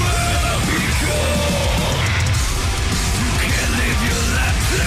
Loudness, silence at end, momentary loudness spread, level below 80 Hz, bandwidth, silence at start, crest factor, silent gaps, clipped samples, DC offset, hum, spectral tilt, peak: -18 LUFS; 0 s; 1 LU; -22 dBFS; 16 kHz; 0 s; 10 dB; none; under 0.1%; under 0.1%; none; -4 dB/octave; -8 dBFS